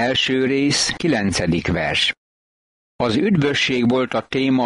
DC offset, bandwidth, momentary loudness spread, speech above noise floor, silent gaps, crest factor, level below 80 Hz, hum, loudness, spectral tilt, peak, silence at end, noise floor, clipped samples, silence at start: under 0.1%; 11.5 kHz; 4 LU; over 72 dB; 2.18-2.99 s; 12 dB; -44 dBFS; none; -19 LUFS; -4.5 dB/octave; -6 dBFS; 0 s; under -90 dBFS; under 0.1%; 0 s